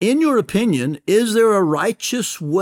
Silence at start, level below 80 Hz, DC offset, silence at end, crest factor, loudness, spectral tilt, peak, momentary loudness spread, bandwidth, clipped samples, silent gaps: 0 s; -56 dBFS; under 0.1%; 0 s; 12 dB; -17 LUFS; -5 dB/octave; -4 dBFS; 7 LU; 17.5 kHz; under 0.1%; none